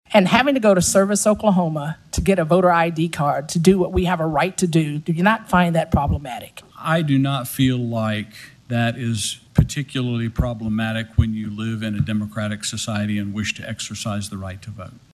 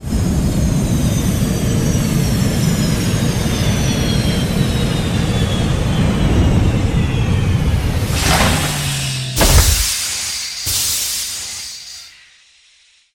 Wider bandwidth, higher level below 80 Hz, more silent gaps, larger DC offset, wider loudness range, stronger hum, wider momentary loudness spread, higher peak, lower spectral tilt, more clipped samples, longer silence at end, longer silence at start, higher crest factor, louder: second, 13.5 kHz vs 17 kHz; second, -36 dBFS vs -22 dBFS; neither; neither; first, 6 LU vs 2 LU; neither; first, 12 LU vs 6 LU; about the same, 0 dBFS vs 0 dBFS; about the same, -5.5 dB/octave vs -4.5 dB/octave; neither; second, 0.2 s vs 1.05 s; about the same, 0.1 s vs 0 s; about the same, 20 dB vs 16 dB; second, -20 LUFS vs -16 LUFS